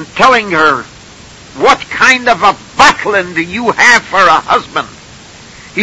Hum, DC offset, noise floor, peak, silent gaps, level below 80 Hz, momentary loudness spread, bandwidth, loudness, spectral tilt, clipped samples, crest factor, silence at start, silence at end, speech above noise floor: none; under 0.1%; -34 dBFS; 0 dBFS; none; -42 dBFS; 11 LU; 11 kHz; -9 LUFS; -2.5 dB/octave; 1%; 10 dB; 0 s; 0 s; 25 dB